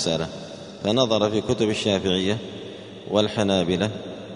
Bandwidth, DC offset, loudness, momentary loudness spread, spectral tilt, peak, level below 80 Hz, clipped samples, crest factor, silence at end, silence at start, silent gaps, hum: 10.5 kHz; under 0.1%; -23 LUFS; 16 LU; -5 dB/octave; -4 dBFS; -54 dBFS; under 0.1%; 20 dB; 0 s; 0 s; none; none